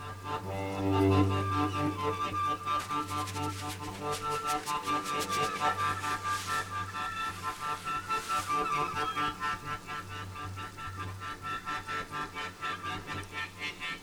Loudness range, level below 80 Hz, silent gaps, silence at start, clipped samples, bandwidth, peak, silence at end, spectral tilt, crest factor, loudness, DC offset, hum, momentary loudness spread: 7 LU; -58 dBFS; none; 0 s; under 0.1%; over 20 kHz; -14 dBFS; 0 s; -4.5 dB/octave; 20 dB; -33 LUFS; under 0.1%; none; 9 LU